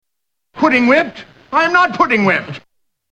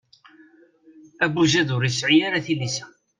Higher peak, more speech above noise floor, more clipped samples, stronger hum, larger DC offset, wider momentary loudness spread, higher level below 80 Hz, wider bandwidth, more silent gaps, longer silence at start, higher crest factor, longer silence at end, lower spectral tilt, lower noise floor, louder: first, 0 dBFS vs -6 dBFS; first, 65 dB vs 33 dB; neither; neither; neither; first, 12 LU vs 8 LU; first, -54 dBFS vs -62 dBFS; about the same, 9.4 kHz vs 9.6 kHz; neither; second, 0.55 s vs 1.2 s; about the same, 16 dB vs 18 dB; first, 0.55 s vs 0.35 s; about the same, -5.5 dB/octave vs -4.5 dB/octave; first, -79 dBFS vs -53 dBFS; first, -14 LUFS vs -21 LUFS